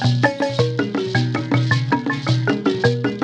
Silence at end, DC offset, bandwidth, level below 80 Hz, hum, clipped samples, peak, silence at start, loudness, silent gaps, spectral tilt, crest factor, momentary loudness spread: 0 s; under 0.1%; 8.8 kHz; -54 dBFS; none; under 0.1%; -2 dBFS; 0 s; -19 LUFS; none; -6.5 dB/octave; 18 dB; 2 LU